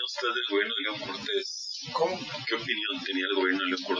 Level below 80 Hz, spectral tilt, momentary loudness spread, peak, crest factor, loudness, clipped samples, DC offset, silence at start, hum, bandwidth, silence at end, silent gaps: -74 dBFS; -2.5 dB/octave; 7 LU; -12 dBFS; 18 dB; -29 LUFS; under 0.1%; under 0.1%; 0 s; none; 7.6 kHz; 0 s; none